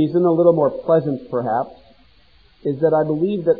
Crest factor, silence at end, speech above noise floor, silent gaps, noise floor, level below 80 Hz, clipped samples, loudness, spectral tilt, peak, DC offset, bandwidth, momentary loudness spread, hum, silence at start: 16 dB; 0 s; 36 dB; none; -54 dBFS; -56 dBFS; under 0.1%; -19 LUFS; -12 dB/octave; -2 dBFS; 0.2%; 4.9 kHz; 10 LU; none; 0 s